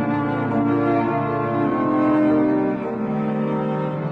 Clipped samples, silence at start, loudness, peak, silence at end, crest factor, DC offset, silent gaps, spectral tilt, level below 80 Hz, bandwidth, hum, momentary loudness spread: under 0.1%; 0 s; -21 LUFS; -10 dBFS; 0 s; 12 dB; under 0.1%; none; -10 dB/octave; -54 dBFS; 4.7 kHz; none; 6 LU